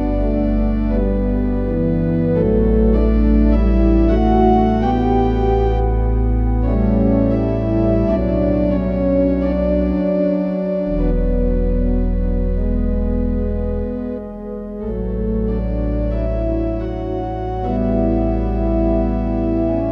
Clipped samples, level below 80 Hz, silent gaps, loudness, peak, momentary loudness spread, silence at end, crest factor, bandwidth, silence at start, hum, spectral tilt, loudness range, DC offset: under 0.1%; -20 dBFS; none; -18 LUFS; -2 dBFS; 8 LU; 0 s; 14 dB; 4.9 kHz; 0 s; none; -11 dB/octave; 7 LU; under 0.1%